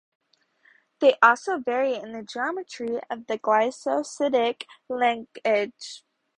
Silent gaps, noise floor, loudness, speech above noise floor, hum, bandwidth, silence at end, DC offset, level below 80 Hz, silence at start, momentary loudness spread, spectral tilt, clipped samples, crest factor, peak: none; -62 dBFS; -24 LUFS; 38 dB; none; 10.5 kHz; 0.4 s; under 0.1%; -74 dBFS; 1 s; 15 LU; -3 dB/octave; under 0.1%; 24 dB; -2 dBFS